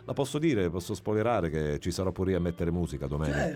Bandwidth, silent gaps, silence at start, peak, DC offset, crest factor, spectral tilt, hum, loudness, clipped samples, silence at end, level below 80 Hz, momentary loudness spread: 16 kHz; none; 0 s; -16 dBFS; under 0.1%; 14 dB; -6.5 dB/octave; none; -30 LUFS; under 0.1%; 0 s; -44 dBFS; 5 LU